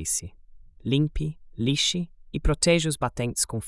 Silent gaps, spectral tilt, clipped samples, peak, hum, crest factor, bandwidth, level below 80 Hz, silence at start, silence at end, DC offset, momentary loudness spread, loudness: none; -4 dB/octave; under 0.1%; -8 dBFS; none; 20 dB; 12 kHz; -36 dBFS; 0 s; 0 s; under 0.1%; 12 LU; -26 LUFS